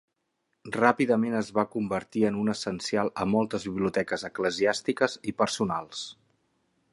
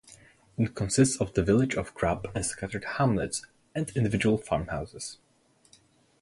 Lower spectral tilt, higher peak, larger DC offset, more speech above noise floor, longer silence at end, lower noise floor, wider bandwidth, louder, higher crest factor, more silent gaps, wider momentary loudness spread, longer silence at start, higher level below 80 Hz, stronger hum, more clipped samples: about the same, -5 dB/octave vs -5.5 dB/octave; about the same, -6 dBFS vs -8 dBFS; neither; first, 51 dB vs 34 dB; second, 0.8 s vs 1.1 s; first, -78 dBFS vs -62 dBFS; about the same, 11.5 kHz vs 11.5 kHz; about the same, -28 LUFS vs -28 LUFS; about the same, 22 dB vs 20 dB; neither; second, 7 LU vs 12 LU; first, 0.65 s vs 0.1 s; second, -62 dBFS vs -48 dBFS; neither; neither